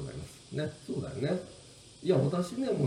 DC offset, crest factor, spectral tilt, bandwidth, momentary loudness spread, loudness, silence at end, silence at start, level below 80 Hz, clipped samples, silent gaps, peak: under 0.1%; 18 dB; -7 dB/octave; 13 kHz; 19 LU; -33 LUFS; 0 s; 0 s; -62 dBFS; under 0.1%; none; -14 dBFS